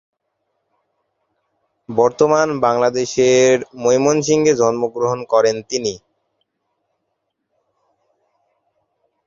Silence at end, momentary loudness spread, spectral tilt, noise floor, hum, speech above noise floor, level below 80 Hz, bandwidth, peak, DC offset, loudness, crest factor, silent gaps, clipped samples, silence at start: 3.3 s; 8 LU; -4.5 dB/octave; -73 dBFS; none; 58 dB; -58 dBFS; 7.6 kHz; 0 dBFS; under 0.1%; -16 LUFS; 18 dB; none; under 0.1%; 1.9 s